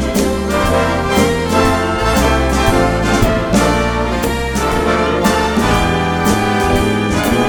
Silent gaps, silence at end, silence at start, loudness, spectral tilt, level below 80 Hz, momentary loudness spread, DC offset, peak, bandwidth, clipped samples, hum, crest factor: none; 0 s; 0 s; -14 LUFS; -5 dB/octave; -24 dBFS; 3 LU; under 0.1%; 0 dBFS; over 20 kHz; under 0.1%; none; 14 dB